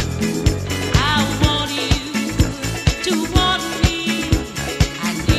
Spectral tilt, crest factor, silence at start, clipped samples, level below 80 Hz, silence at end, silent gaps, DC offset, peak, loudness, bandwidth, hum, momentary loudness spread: -4.5 dB/octave; 18 dB; 0 s; under 0.1%; -26 dBFS; 0 s; none; under 0.1%; 0 dBFS; -19 LUFS; 15.5 kHz; none; 4 LU